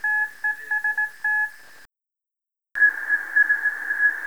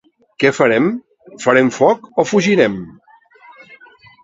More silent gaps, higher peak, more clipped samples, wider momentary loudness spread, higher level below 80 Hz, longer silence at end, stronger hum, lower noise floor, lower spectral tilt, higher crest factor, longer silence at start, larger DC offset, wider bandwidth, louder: neither; second, -8 dBFS vs 0 dBFS; neither; second, 7 LU vs 11 LU; second, -76 dBFS vs -58 dBFS; second, 0 s vs 0.5 s; neither; first, -84 dBFS vs -46 dBFS; second, 0 dB/octave vs -5.5 dB/octave; about the same, 16 dB vs 16 dB; second, 0.05 s vs 0.4 s; first, 0.4% vs under 0.1%; first, over 20 kHz vs 8 kHz; second, -21 LUFS vs -15 LUFS